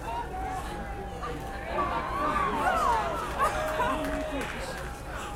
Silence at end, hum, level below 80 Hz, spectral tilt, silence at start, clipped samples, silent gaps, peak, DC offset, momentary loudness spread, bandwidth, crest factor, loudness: 0 s; none; -40 dBFS; -4.5 dB/octave; 0 s; under 0.1%; none; -14 dBFS; under 0.1%; 11 LU; 16 kHz; 16 dB; -30 LUFS